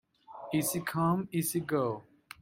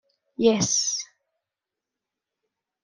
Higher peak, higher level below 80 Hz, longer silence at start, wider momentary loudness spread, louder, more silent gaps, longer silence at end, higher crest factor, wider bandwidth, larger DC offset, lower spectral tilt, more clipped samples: second, -16 dBFS vs -6 dBFS; about the same, -68 dBFS vs -66 dBFS; about the same, 0.3 s vs 0.4 s; second, 18 LU vs 21 LU; second, -32 LUFS vs -23 LUFS; neither; second, 0.4 s vs 1.8 s; second, 16 dB vs 22 dB; first, 16.5 kHz vs 11 kHz; neither; first, -5.5 dB/octave vs -3 dB/octave; neither